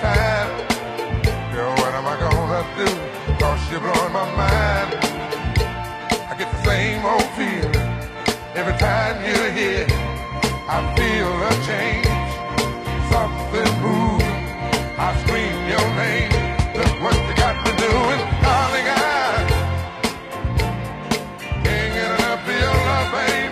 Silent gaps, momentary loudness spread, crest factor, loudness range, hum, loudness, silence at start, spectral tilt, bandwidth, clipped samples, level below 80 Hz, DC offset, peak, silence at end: none; 6 LU; 16 dB; 3 LU; none; -20 LUFS; 0 s; -5 dB/octave; 15.5 kHz; under 0.1%; -28 dBFS; under 0.1%; -4 dBFS; 0 s